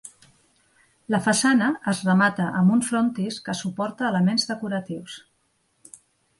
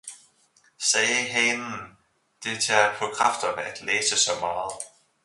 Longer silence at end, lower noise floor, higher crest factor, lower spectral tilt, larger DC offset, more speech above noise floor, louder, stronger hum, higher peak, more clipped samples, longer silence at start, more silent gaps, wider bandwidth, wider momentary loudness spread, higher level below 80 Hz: first, 1.2 s vs 0.35 s; first, -69 dBFS vs -62 dBFS; about the same, 18 dB vs 22 dB; first, -4.5 dB/octave vs -0.5 dB/octave; neither; first, 46 dB vs 38 dB; about the same, -23 LUFS vs -23 LUFS; neither; about the same, -6 dBFS vs -4 dBFS; neither; about the same, 0.05 s vs 0.05 s; neither; about the same, 11.5 kHz vs 11.5 kHz; second, 10 LU vs 15 LU; about the same, -66 dBFS vs -66 dBFS